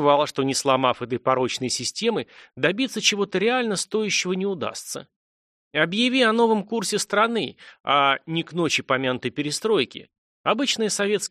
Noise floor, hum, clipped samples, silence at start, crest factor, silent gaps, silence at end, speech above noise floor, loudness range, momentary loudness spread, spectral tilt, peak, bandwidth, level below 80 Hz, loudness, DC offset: under -90 dBFS; none; under 0.1%; 0 s; 18 dB; 5.16-5.71 s, 7.80-7.84 s, 10.18-10.44 s; 0.05 s; over 67 dB; 2 LU; 10 LU; -3 dB/octave; -6 dBFS; 13 kHz; -68 dBFS; -23 LUFS; under 0.1%